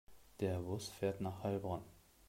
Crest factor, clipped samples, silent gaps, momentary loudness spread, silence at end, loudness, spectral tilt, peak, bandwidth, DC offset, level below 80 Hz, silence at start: 18 dB; under 0.1%; none; 5 LU; 0.3 s; -42 LUFS; -6.5 dB/octave; -24 dBFS; 16 kHz; under 0.1%; -68 dBFS; 0.1 s